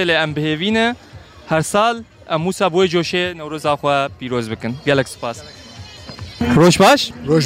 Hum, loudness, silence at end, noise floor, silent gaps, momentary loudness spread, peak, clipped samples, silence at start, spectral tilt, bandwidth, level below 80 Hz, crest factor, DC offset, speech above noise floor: none; -17 LUFS; 0 s; -36 dBFS; none; 21 LU; -4 dBFS; under 0.1%; 0 s; -5 dB/octave; 16 kHz; -44 dBFS; 14 dB; under 0.1%; 19 dB